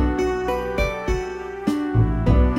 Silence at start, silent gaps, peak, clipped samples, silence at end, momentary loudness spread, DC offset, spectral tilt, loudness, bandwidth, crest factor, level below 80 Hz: 0 s; none; -4 dBFS; under 0.1%; 0 s; 7 LU; under 0.1%; -7.5 dB/octave; -23 LUFS; 13.5 kHz; 16 dB; -24 dBFS